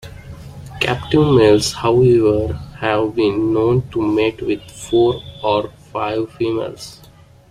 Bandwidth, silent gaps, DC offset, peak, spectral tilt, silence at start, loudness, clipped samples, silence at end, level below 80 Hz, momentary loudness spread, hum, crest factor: 13.5 kHz; none; under 0.1%; -2 dBFS; -6 dB/octave; 0.05 s; -17 LUFS; under 0.1%; 0.55 s; -40 dBFS; 17 LU; none; 16 dB